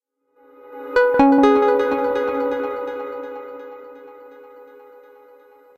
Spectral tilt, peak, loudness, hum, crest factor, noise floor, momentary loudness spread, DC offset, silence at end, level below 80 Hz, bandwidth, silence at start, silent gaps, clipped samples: -6 dB/octave; -2 dBFS; -18 LUFS; none; 18 dB; -56 dBFS; 25 LU; under 0.1%; 1.15 s; -52 dBFS; 12.5 kHz; 0.65 s; none; under 0.1%